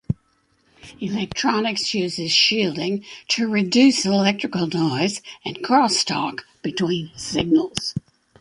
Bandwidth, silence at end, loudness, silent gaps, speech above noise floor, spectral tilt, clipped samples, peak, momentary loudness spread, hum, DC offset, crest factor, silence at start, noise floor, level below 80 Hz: 11.5 kHz; 0.4 s; -21 LUFS; none; 43 dB; -4 dB/octave; under 0.1%; -2 dBFS; 14 LU; none; under 0.1%; 20 dB; 0.1 s; -64 dBFS; -54 dBFS